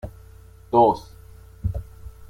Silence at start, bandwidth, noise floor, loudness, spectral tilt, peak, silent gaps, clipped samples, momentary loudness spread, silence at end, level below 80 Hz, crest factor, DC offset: 0.05 s; 16 kHz; -46 dBFS; -22 LUFS; -8.5 dB/octave; -4 dBFS; none; under 0.1%; 21 LU; 0.05 s; -40 dBFS; 20 dB; under 0.1%